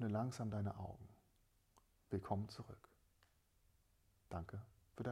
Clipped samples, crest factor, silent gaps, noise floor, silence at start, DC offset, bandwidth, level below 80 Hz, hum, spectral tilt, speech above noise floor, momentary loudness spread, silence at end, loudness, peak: under 0.1%; 20 dB; none; -77 dBFS; 0 s; under 0.1%; 14.5 kHz; -68 dBFS; none; -7.5 dB/octave; 31 dB; 17 LU; 0 s; -47 LUFS; -28 dBFS